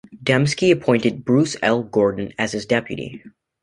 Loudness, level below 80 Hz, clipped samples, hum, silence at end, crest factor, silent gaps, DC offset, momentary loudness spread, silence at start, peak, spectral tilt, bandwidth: -19 LUFS; -54 dBFS; under 0.1%; none; 0.35 s; 18 dB; none; under 0.1%; 8 LU; 0.1 s; -2 dBFS; -5.5 dB/octave; 11.5 kHz